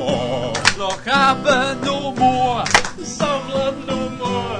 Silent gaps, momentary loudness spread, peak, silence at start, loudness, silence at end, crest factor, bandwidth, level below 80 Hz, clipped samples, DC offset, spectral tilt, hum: none; 8 LU; 0 dBFS; 0 s; -18 LUFS; 0 s; 18 dB; 11 kHz; -42 dBFS; under 0.1%; under 0.1%; -3.5 dB/octave; none